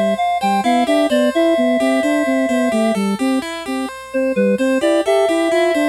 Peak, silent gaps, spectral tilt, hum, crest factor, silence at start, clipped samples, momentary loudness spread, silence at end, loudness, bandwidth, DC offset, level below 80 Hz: -4 dBFS; none; -5 dB/octave; none; 12 dB; 0 s; under 0.1%; 6 LU; 0 s; -16 LUFS; 15 kHz; under 0.1%; -52 dBFS